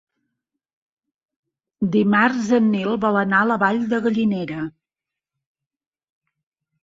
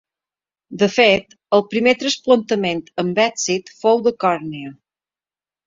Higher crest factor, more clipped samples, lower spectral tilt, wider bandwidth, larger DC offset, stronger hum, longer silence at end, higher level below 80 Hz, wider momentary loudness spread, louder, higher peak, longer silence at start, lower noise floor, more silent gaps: about the same, 18 dB vs 18 dB; neither; first, -7 dB/octave vs -4 dB/octave; about the same, 7.6 kHz vs 7.8 kHz; neither; neither; first, 2.15 s vs 0.95 s; about the same, -62 dBFS vs -60 dBFS; about the same, 9 LU vs 10 LU; about the same, -19 LUFS vs -18 LUFS; second, -4 dBFS vs 0 dBFS; first, 1.8 s vs 0.7 s; about the same, -89 dBFS vs under -90 dBFS; neither